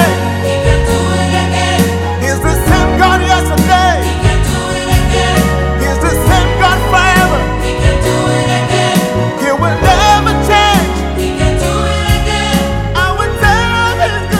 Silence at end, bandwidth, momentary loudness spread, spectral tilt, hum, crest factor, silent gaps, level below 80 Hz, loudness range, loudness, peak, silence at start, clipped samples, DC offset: 0 s; 17 kHz; 5 LU; -5 dB/octave; none; 10 dB; none; -18 dBFS; 1 LU; -11 LUFS; 0 dBFS; 0 s; under 0.1%; under 0.1%